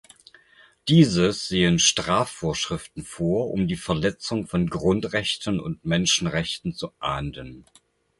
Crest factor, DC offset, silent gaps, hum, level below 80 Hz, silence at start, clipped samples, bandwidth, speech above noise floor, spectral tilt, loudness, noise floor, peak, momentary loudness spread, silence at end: 20 dB; under 0.1%; none; none; -46 dBFS; 0.85 s; under 0.1%; 11.5 kHz; 32 dB; -4.5 dB/octave; -23 LUFS; -56 dBFS; -4 dBFS; 13 LU; 0.6 s